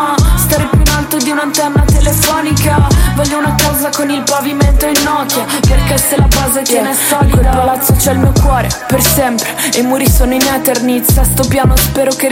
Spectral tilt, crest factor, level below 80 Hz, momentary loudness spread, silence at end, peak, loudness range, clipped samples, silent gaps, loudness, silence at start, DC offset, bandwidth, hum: -4.5 dB/octave; 10 dB; -16 dBFS; 3 LU; 0 s; 0 dBFS; 1 LU; under 0.1%; none; -11 LUFS; 0 s; under 0.1%; 17 kHz; none